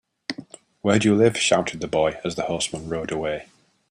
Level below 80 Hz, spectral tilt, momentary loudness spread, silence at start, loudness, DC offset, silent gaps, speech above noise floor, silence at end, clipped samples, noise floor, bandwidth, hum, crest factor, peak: -54 dBFS; -4.5 dB/octave; 16 LU; 0.3 s; -22 LUFS; under 0.1%; none; 21 dB; 0.5 s; under 0.1%; -43 dBFS; 11.5 kHz; none; 20 dB; -2 dBFS